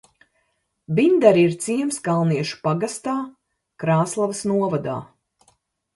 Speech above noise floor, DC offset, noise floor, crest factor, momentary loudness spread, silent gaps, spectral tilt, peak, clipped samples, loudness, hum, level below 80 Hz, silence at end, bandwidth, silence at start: 51 dB; under 0.1%; -71 dBFS; 22 dB; 13 LU; none; -6 dB/octave; 0 dBFS; under 0.1%; -21 LUFS; none; -64 dBFS; 0.9 s; 11.5 kHz; 0.9 s